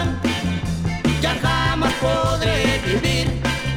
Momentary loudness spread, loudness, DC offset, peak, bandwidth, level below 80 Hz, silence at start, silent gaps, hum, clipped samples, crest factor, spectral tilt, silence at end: 4 LU; -20 LUFS; under 0.1%; -4 dBFS; 17 kHz; -30 dBFS; 0 s; none; none; under 0.1%; 16 dB; -5 dB/octave; 0 s